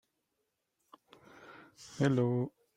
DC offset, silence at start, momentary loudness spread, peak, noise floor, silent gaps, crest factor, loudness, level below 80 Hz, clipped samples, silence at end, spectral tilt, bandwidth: under 0.1%; 1.5 s; 24 LU; -16 dBFS; -83 dBFS; none; 22 dB; -32 LUFS; -74 dBFS; under 0.1%; 0.3 s; -7.5 dB/octave; 10.5 kHz